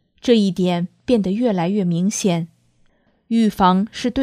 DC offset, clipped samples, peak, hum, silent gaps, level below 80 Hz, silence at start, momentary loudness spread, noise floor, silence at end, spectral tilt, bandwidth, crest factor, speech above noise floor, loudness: under 0.1%; under 0.1%; -2 dBFS; none; none; -50 dBFS; 0.25 s; 7 LU; -59 dBFS; 0 s; -6 dB/octave; 14.5 kHz; 18 dB; 41 dB; -19 LUFS